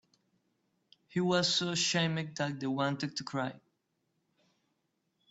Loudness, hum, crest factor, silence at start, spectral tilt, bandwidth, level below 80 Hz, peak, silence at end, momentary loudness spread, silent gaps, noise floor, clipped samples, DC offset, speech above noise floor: -32 LUFS; none; 20 dB; 1.1 s; -4 dB/octave; 8.2 kHz; -74 dBFS; -16 dBFS; 1.75 s; 9 LU; none; -80 dBFS; under 0.1%; under 0.1%; 48 dB